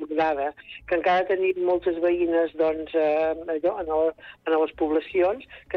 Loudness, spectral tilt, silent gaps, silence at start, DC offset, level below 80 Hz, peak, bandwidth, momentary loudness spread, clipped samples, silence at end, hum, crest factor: -24 LUFS; -7 dB/octave; none; 0 s; under 0.1%; -56 dBFS; -12 dBFS; 6.2 kHz; 6 LU; under 0.1%; 0 s; none; 14 dB